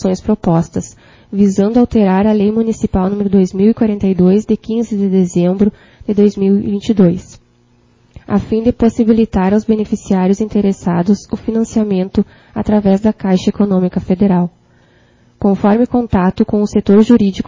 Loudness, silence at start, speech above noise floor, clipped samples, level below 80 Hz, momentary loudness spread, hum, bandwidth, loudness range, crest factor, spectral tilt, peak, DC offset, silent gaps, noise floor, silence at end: -13 LUFS; 0 s; 39 dB; under 0.1%; -36 dBFS; 6 LU; none; 7.6 kHz; 2 LU; 12 dB; -8 dB/octave; 0 dBFS; under 0.1%; none; -51 dBFS; 0.05 s